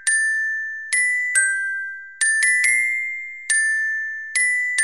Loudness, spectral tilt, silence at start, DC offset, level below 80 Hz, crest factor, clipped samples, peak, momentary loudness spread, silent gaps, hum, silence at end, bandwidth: -19 LUFS; 7.5 dB/octave; 0 s; 0.2%; -86 dBFS; 16 dB; under 0.1%; -4 dBFS; 10 LU; none; none; 0 s; 16.5 kHz